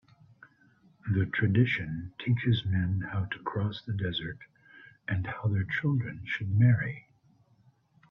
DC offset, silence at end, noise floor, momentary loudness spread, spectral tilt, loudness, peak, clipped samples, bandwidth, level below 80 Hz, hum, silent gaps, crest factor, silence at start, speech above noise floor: under 0.1%; 1.1 s; -65 dBFS; 12 LU; -9 dB/octave; -30 LUFS; -12 dBFS; under 0.1%; 5.4 kHz; -58 dBFS; none; none; 18 dB; 1.05 s; 36 dB